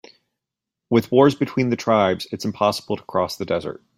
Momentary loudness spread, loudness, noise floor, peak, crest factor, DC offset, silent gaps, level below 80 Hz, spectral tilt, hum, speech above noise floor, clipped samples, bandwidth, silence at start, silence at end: 9 LU; -21 LUFS; -85 dBFS; -2 dBFS; 18 dB; under 0.1%; none; -60 dBFS; -6 dB/octave; none; 65 dB; under 0.1%; 16 kHz; 0.9 s; 0.25 s